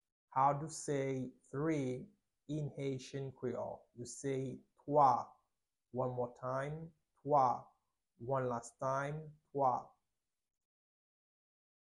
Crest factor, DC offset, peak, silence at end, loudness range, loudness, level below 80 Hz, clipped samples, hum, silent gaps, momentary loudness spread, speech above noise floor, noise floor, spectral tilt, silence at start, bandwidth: 22 dB; under 0.1%; -16 dBFS; 2.1 s; 5 LU; -38 LUFS; -74 dBFS; under 0.1%; none; none; 16 LU; over 53 dB; under -90 dBFS; -6.5 dB/octave; 0.3 s; 11.5 kHz